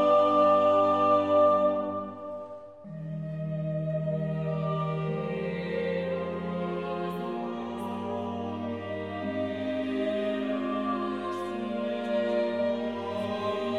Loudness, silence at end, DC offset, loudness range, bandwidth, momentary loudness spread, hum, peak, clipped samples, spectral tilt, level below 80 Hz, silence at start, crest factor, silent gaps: -29 LUFS; 0 s; under 0.1%; 7 LU; 9.2 kHz; 13 LU; none; -12 dBFS; under 0.1%; -8 dB/octave; -66 dBFS; 0 s; 16 dB; none